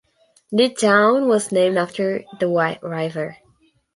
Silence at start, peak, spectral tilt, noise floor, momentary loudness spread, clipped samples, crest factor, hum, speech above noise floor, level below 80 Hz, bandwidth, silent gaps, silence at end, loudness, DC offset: 0.5 s; -2 dBFS; -4.5 dB/octave; -59 dBFS; 11 LU; under 0.1%; 18 dB; none; 41 dB; -68 dBFS; 11.5 kHz; none; 0.6 s; -19 LUFS; under 0.1%